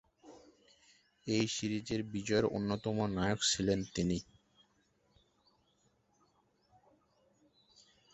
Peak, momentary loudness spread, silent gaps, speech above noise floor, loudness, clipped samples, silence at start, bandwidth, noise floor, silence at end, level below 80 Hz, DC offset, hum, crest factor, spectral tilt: -18 dBFS; 7 LU; none; 40 dB; -35 LUFS; under 0.1%; 0.25 s; 8 kHz; -74 dBFS; 3.9 s; -60 dBFS; under 0.1%; none; 20 dB; -4.5 dB/octave